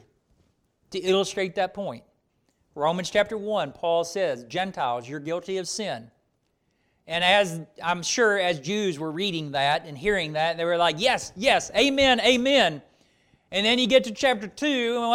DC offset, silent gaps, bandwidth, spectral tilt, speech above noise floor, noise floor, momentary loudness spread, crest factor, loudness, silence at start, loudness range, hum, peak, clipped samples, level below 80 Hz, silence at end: under 0.1%; none; 15.5 kHz; -3.5 dB/octave; 47 dB; -72 dBFS; 11 LU; 18 dB; -24 LUFS; 0.9 s; 7 LU; none; -8 dBFS; under 0.1%; -56 dBFS; 0 s